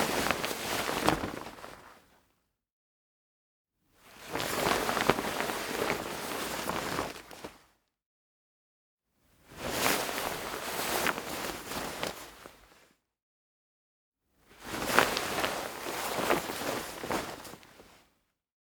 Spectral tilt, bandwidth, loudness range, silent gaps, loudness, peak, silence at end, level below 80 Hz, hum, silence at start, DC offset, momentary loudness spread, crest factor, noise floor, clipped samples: -2.5 dB/octave; over 20 kHz; 9 LU; 2.72-3.65 s, 8.06-8.97 s, 13.22-14.12 s; -32 LUFS; -2 dBFS; 0.8 s; -58 dBFS; none; 0 s; under 0.1%; 19 LU; 34 dB; -76 dBFS; under 0.1%